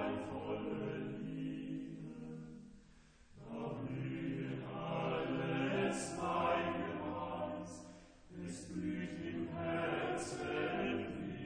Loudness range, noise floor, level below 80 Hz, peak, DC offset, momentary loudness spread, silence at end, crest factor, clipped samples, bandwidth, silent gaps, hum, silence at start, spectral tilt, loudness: 7 LU; -63 dBFS; -66 dBFS; -24 dBFS; under 0.1%; 13 LU; 0 s; 18 dB; under 0.1%; 9.8 kHz; none; none; 0 s; -5.5 dB/octave; -41 LUFS